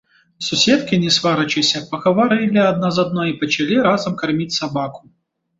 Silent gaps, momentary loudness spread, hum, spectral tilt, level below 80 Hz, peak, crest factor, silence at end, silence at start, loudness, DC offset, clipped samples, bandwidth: none; 6 LU; none; -4.5 dB/octave; -56 dBFS; -2 dBFS; 16 dB; 0.6 s; 0.4 s; -17 LUFS; under 0.1%; under 0.1%; 8 kHz